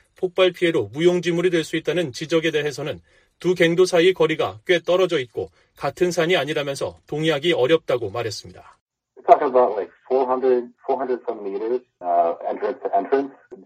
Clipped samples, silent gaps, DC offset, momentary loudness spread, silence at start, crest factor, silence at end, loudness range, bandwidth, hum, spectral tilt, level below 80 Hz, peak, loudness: under 0.1%; 8.81-8.86 s; under 0.1%; 12 LU; 0.2 s; 20 dB; 0.05 s; 3 LU; 15 kHz; none; -5 dB/octave; -62 dBFS; 0 dBFS; -21 LUFS